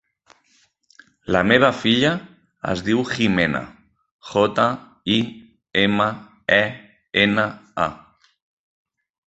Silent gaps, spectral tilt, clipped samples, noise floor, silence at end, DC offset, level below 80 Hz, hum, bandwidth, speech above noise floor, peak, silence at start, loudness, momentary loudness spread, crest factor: 4.11-4.19 s; -5.5 dB/octave; under 0.1%; -62 dBFS; 1.3 s; under 0.1%; -52 dBFS; none; 8.2 kHz; 42 dB; -2 dBFS; 1.3 s; -20 LUFS; 13 LU; 20 dB